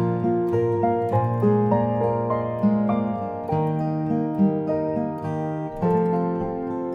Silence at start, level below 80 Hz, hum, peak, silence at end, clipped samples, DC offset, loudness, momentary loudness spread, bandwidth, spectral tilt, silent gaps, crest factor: 0 s; -52 dBFS; none; -8 dBFS; 0 s; under 0.1%; under 0.1%; -23 LUFS; 7 LU; 5.4 kHz; -11 dB/octave; none; 14 dB